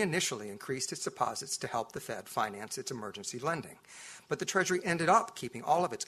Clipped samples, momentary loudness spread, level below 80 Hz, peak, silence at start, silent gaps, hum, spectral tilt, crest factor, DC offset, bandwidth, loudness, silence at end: under 0.1%; 12 LU; -72 dBFS; -12 dBFS; 0 s; none; none; -3 dB/octave; 22 dB; under 0.1%; 14 kHz; -33 LUFS; 0.05 s